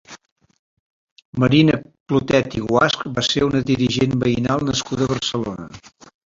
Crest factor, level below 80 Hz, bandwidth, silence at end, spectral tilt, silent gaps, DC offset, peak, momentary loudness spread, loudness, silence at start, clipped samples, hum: 18 dB; -46 dBFS; 7.8 kHz; 0.4 s; -5.5 dB/octave; 0.32-0.36 s, 0.59-1.16 s, 1.25-1.33 s, 2.00-2.06 s; under 0.1%; -2 dBFS; 10 LU; -19 LUFS; 0.1 s; under 0.1%; none